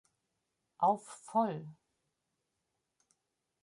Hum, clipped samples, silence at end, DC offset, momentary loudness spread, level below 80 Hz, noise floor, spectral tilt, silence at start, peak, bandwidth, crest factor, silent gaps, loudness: none; under 0.1%; 1.9 s; under 0.1%; 13 LU; -88 dBFS; -85 dBFS; -6.5 dB/octave; 0.8 s; -18 dBFS; 11.5 kHz; 22 dB; none; -34 LUFS